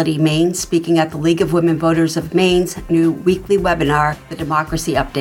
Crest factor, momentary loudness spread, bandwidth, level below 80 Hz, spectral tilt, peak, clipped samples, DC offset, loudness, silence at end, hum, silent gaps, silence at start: 14 dB; 4 LU; 16.5 kHz; -36 dBFS; -5.5 dB/octave; -2 dBFS; under 0.1%; under 0.1%; -16 LUFS; 0 s; none; none; 0 s